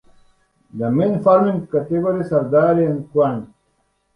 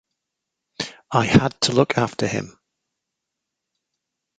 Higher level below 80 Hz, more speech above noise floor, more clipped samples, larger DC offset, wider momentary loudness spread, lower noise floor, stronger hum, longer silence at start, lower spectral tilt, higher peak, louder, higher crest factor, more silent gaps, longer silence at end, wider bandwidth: second, -54 dBFS vs -48 dBFS; second, 49 dB vs 63 dB; neither; neither; second, 8 LU vs 14 LU; second, -66 dBFS vs -82 dBFS; neither; about the same, 0.75 s vs 0.8 s; first, -10.5 dB/octave vs -5 dB/octave; about the same, -2 dBFS vs -2 dBFS; about the same, -18 LUFS vs -20 LUFS; second, 16 dB vs 22 dB; neither; second, 0.7 s vs 1.9 s; about the same, 9.8 kHz vs 9.4 kHz